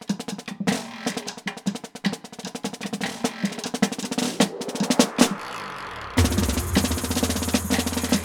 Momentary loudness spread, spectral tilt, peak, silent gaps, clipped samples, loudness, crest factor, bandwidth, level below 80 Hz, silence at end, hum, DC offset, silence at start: 11 LU; -4 dB/octave; -2 dBFS; none; under 0.1%; -25 LUFS; 24 dB; over 20 kHz; -40 dBFS; 0 s; none; under 0.1%; 0 s